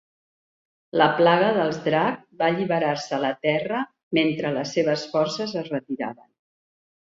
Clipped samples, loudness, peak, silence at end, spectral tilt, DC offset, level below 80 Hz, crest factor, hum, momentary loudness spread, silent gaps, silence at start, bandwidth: under 0.1%; -23 LUFS; -4 dBFS; 0.9 s; -5.5 dB/octave; under 0.1%; -68 dBFS; 20 dB; none; 11 LU; 4.03-4.11 s; 0.95 s; 7.8 kHz